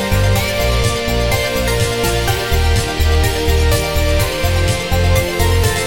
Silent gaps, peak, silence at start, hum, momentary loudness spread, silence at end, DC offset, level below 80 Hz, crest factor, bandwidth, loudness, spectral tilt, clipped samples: none; -2 dBFS; 0 s; none; 2 LU; 0 s; under 0.1%; -20 dBFS; 14 dB; 17 kHz; -15 LUFS; -4.5 dB/octave; under 0.1%